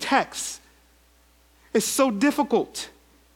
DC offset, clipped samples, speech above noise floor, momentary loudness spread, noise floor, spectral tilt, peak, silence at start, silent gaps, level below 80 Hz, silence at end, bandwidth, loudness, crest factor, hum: under 0.1%; under 0.1%; 35 dB; 14 LU; -58 dBFS; -3 dB/octave; -4 dBFS; 0 s; none; -60 dBFS; 0.45 s; 17.5 kHz; -24 LUFS; 22 dB; none